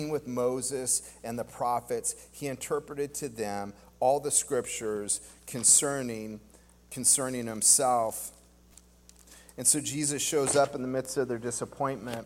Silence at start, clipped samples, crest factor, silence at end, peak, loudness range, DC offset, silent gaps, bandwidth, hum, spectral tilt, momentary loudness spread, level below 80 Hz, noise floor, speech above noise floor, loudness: 0 s; under 0.1%; 24 dB; 0 s; -6 dBFS; 7 LU; under 0.1%; none; 17 kHz; 60 Hz at -60 dBFS; -2.5 dB/octave; 16 LU; -62 dBFS; -57 dBFS; 28 dB; -28 LUFS